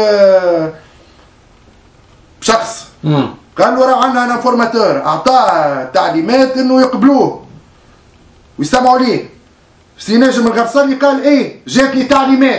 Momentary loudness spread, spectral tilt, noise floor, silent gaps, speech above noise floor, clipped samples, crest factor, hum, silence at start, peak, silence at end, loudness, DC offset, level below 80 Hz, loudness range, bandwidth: 8 LU; -5 dB/octave; -46 dBFS; none; 36 dB; 0.3%; 12 dB; none; 0 s; 0 dBFS; 0 s; -11 LUFS; under 0.1%; -48 dBFS; 4 LU; 8 kHz